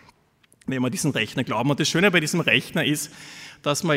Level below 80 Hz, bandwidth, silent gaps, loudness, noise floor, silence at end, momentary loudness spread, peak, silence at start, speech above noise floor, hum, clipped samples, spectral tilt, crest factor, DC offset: -62 dBFS; 16 kHz; none; -22 LUFS; -61 dBFS; 0 s; 14 LU; -2 dBFS; 0.7 s; 38 dB; none; under 0.1%; -4 dB/octave; 22 dB; under 0.1%